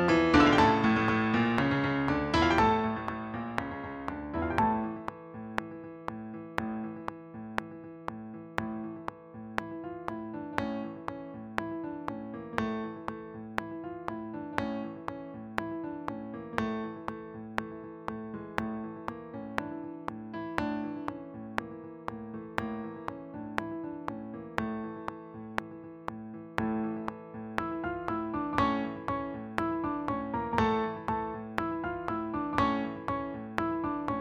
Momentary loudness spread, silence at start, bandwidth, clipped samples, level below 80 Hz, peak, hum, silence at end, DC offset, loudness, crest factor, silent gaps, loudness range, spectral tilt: 15 LU; 0 s; 12.5 kHz; under 0.1%; -54 dBFS; -6 dBFS; none; 0 s; under 0.1%; -33 LUFS; 26 dB; none; 9 LU; -6.5 dB/octave